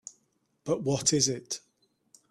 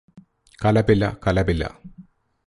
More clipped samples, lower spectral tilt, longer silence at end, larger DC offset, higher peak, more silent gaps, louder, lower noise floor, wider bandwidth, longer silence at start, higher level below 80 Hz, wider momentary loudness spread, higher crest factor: neither; second, -3.5 dB/octave vs -7.5 dB/octave; first, 0.75 s vs 0.45 s; neither; second, -10 dBFS vs -4 dBFS; neither; second, -28 LUFS vs -21 LUFS; first, -73 dBFS vs -49 dBFS; first, 14 kHz vs 11.5 kHz; about the same, 0.05 s vs 0.15 s; second, -66 dBFS vs -36 dBFS; first, 17 LU vs 8 LU; about the same, 22 dB vs 18 dB